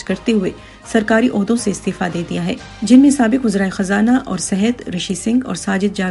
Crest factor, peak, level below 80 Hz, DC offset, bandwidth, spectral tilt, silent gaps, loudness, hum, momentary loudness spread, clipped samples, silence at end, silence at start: 16 dB; 0 dBFS; -44 dBFS; under 0.1%; 11.5 kHz; -5 dB/octave; none; -16 LUFS; none; 10 LU; under 0.1%; 0 s; 0 s